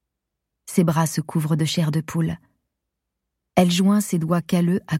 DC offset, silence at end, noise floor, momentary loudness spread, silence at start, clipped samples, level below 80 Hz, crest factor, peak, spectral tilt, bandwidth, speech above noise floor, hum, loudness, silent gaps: under 0.1%; 0 s; -81 dBFS; 7 LU; 0.65 s; under 0.1%; -56 dBFS; 20 dB; -2 dBFS; -6 dB/octave; 16 kHz; 61 dB; none; -21 LUFS; none